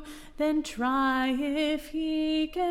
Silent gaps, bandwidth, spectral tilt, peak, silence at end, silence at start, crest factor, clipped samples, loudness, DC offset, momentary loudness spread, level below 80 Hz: none; 15.5 kHz; -3.5 dB/octave; -18 dBFS; 0 s; 0 s; 10 dB; under 0.1%; -28 LUFS; under 0.1%; 5 LU; -50 dBFS